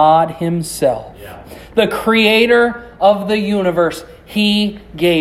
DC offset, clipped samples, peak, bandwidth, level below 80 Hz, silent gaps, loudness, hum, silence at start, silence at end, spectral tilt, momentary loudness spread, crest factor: under 0.1%; under 0.1%; 0 dBFS; 16 kHz; -44 dBFS; none; -15 LUFS; none; 0 s; 0 s; -5 dB/octave; 16 LU; 14 dB